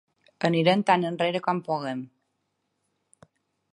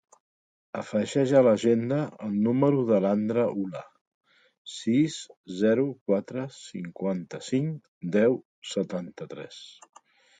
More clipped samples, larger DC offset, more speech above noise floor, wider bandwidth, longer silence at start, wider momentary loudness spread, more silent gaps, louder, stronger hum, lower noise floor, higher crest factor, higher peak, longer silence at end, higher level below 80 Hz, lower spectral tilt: neither; neither; second, 53 dB vs over 64 dB; first, 11 kHz vs 9.4 kHz; second, 0.4 s vs 0.75 s; second, 13 LU vs 17 LU; second, none vs 4.01-4.21 s, 4.58-4.65 s, 5.37-5.44 s, 6.01-6.06 s, 7.88-8.01 s, 8.45-8.62 s; about the same, -25 LUFS vs -26 LUFS; neither; second, -77 dBFS vs under -90 dBFS; about the same, 22 dB vs 20 dB; about the same, -6 dBFS vs -8 dBFS; first, 1.65 s vs 0.7 s; about the same, -76 dBFS vs -72 dBFS; about the same, -6.5 dB/octave vs -6.5 dB/octave